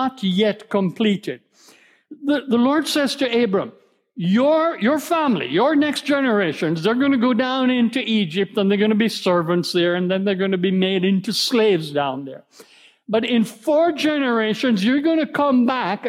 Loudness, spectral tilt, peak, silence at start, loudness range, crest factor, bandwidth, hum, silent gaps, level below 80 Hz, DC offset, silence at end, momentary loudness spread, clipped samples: -19 LUFS; -5.5 dB/octave; -6 dBFS; 0 s; 2 LU; 12 dB; 16 kHz; none; none; -72 dBFS; under 0.1%; 0 s; 5 LU; under 0.1%